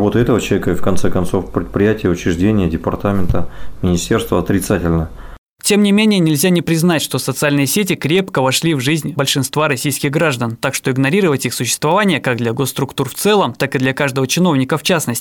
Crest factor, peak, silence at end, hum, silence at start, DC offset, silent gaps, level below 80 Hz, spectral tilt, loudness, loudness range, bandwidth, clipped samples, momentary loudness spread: 12 dB; -2 dBFS; 0 s; none; 0 s; under 0.1%; 5.38-5.56 s; -36 dBFS; -5 dB/octave; -15 LUFS; 3 LU; 18 kHz; under 0.1%; 5 LU